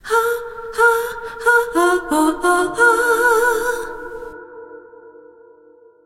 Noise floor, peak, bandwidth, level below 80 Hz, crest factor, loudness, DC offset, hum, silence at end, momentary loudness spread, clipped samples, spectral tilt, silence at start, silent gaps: -48 dBFS; -2 dBFS; 16.5 kHz; -48 dBFS; 16 dB; -16 LUFS; under 0.1%; none; 0.95 s; 18 LU; under 0.1%; -2.5 dB/octave; 0.05 s; none